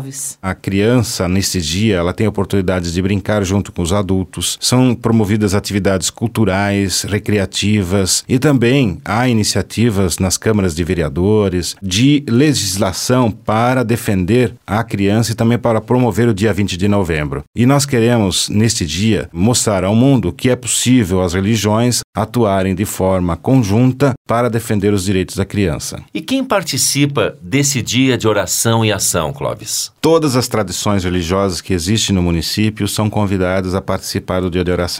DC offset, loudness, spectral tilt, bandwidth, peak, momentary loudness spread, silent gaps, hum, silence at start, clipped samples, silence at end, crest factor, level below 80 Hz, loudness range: 0.1%; -15 LUFS; -5 dB/octave; 16.5 kHz; 0 dBFS; 5 LU; 17.47-17.53 s, 22.04-22.13 s, 24.17-24.25 s; none; 0 s; under 0.1%; 0 s; 14 dB; -38 dBFS; 2 LU